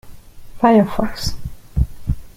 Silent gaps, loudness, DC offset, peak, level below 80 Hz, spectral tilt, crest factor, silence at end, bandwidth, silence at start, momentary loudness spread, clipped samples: none; -19 LUFS; under 0.1%; -2 dBFS; -28 dBFS; -6.5 dB/octave; 18 dB; 0.05 s; 16 kHz; 0.05 s; 14 LU; under 0.1%